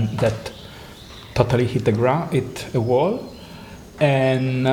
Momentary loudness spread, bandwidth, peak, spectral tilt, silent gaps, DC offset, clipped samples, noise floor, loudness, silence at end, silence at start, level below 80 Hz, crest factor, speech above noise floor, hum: 20 LU; 16.5 kHz; 0 dBFS; -7 dB/octave; none; under 0.1%; under 0.1%; -40 dBFS; -21 LUFS; 0 s; 0 s; -46 dBFS; 20 dB; 20 dB; none